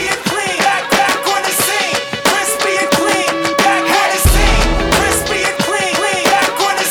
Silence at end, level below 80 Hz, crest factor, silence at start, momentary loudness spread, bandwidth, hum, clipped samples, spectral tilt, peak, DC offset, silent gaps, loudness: 0 s; -22 dBFS; 14 dB; 0 s; 3 LU; over 20 kHz; none; under 0.1%; -2.5 dB/octave; 0 dBFS; under 0.1%; none; -13 LUFS